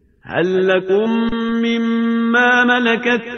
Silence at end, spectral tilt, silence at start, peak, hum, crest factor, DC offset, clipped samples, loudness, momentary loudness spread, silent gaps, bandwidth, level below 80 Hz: 0 s; -5.5 dB/octave; 0.25 s; -2 dBFS; none; 14 dB; under 0.1%; under 0.1%; -16 LUFS; 6 LU; none; 6.6 kHz; -48 dBFS